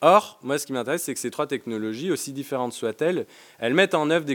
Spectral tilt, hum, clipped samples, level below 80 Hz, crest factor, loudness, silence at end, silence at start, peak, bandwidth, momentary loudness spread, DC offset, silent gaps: -4 dB/octave; none; under 0.1%; -80 dBFS; 22 dB; -25 LUFS; 0 s; 0 s; -2 dBFS; 17.5 kHz; 10 LU; under 0.1%; none